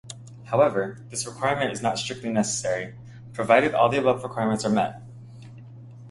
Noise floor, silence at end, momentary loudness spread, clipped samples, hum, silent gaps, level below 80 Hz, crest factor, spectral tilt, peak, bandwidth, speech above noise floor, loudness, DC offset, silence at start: -43 dBFS; 0 s; 24 LU; under 0.1%; none; none; -60 dBFS; 22 dB; -4.5 dB/octave; -4 dBFS; 11.5 kHz; 20 dB; -24 LUFS; under 0.1%; 0.05 s